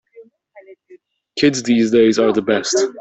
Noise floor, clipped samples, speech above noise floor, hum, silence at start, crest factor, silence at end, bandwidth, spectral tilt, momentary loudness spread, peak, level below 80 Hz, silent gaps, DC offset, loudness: -48 dBFS; under 0.1%; 33 dB; none; 0.15 s; 14 dB; 0 s; 8.4 kHz; -4 dB/octave; 5 LU; -2 dBFS; -58 dBFS; none; under 0.1%; -15 LUFS